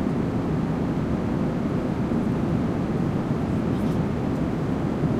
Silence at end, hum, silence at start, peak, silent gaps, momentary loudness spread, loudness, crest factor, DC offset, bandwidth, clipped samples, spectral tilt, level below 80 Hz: 0 s; none; 0 s; -10 dBFS; none; 1 LU; -25 LUFS; 14 dB; under 0.1%; 12.5 kHz; under 0.1%; -8.5 dB/octave; -40 dBFS